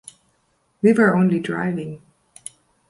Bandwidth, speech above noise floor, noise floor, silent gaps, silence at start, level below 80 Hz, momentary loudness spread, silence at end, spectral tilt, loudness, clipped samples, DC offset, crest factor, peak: 11.5 kHz; 48 dB; -66 dBFS; none; 0.85 s; -62 dBFS; 23 LU; 0.9 s; -7 dB/octave; -19 LUFS; under 0.1%; under 0.1%; 18 dB; -4 dBFS